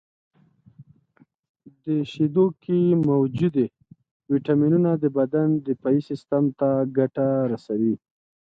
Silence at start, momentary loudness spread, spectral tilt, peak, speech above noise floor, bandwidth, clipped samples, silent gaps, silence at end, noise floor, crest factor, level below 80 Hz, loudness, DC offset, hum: 0.8 s; 7 LU; -10.5 dB/octave; -8 dBFS; 39 dB; 7.4 kHz; under 0.1%; 1.39-1.43 s, 1.49-1.54 s, 4.11-4.20 s; 0.55 s; -60 dBFS; 16 dB; -64 dBFS; -23 LUFS; under 0.1%; none